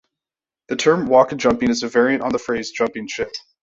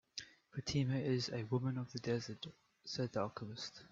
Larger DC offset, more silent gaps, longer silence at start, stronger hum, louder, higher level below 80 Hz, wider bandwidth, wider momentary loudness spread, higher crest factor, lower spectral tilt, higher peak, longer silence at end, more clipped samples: neither; neither; first, 0.7 s vs 0.15 s; neither; first, -19 LUFS vs -41 LUFS; first, -52 dBFS vs -70 dBFS; about the same, 8 kHz vs 7.6 kHz; about the same, 12 LU vs 13 LU; about the same, 18 dB vs 18 dB; about the same, -4.5 dB/octave vs -5.5 dB/octave; first, -2 dBFS vs -24 dBFS; first, 0.25 s vs 0.05 s; neither